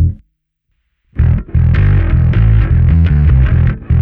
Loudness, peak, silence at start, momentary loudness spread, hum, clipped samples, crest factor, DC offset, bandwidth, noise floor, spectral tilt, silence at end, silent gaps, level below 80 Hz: -12 LUFS; 0 dBFS; 0 s; 5 LU; none; under 0.1%; 10 dB; under 0.1%; 3.9 kHz; -66 dBFS; -11 dB/octave; 0 s; none; -14 dBFS